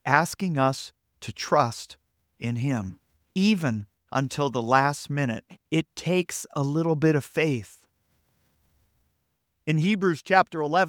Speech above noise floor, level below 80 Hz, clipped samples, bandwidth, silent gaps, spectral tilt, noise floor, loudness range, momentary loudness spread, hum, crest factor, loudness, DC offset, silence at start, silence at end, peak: 51 dB; -64 dBFS; under 0.1%; 18 kHz; none; -5.5 dB/octave; -76 dBFS; 3 LU; 13 LU; none; 24 dB; -25 LUFS; under 0.1%; 0.05 s; 0 s; -2 dBFS